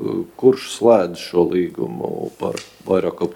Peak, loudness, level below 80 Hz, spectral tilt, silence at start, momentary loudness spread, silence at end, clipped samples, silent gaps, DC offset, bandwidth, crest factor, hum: 0 dBFS; -19 LUFS; -60 dBFS; -6 dB/octave; 0 s; 11 LU; 0 s; under 0.1%; none; under 0.1%; 16.5 kHz; 18 dB; none